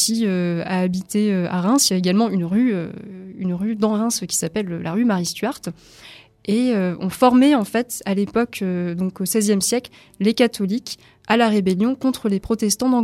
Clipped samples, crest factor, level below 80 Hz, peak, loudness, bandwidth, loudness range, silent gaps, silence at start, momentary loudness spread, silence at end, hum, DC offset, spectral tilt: under 0.1%; 18 dB; -54 dBFS; -2 dBFS; -20 LUFS; 16 kHz; 3 LU; none; 0 s; 10 LU; 0 s; none; under 0.1%; -4.5 dB/octave